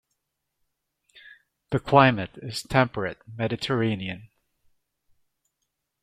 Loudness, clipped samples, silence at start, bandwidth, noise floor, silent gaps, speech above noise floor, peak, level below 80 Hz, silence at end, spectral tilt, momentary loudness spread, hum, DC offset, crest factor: -24 LUFS; under 0.1%; 1.7 s; 14.5 kHz; -80 dBFS; none; 56 dB; -2 dBFS; -56 dBFS; 1.8 s; -6 dB/octave; 15 LU; none; under 0.1%; 26 dB